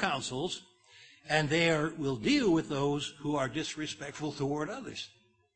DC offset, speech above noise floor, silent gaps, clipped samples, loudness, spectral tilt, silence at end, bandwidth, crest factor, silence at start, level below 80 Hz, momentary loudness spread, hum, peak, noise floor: under 0.1%; 27 dB; none; under 0.1%; -32 LUFS; -4.5 dB/octave; 0.5 s; 8.8 kHz; 22 dB; 0 s; -60 dBFS; 13 LU; none; -12 dBFS; -58 dBFS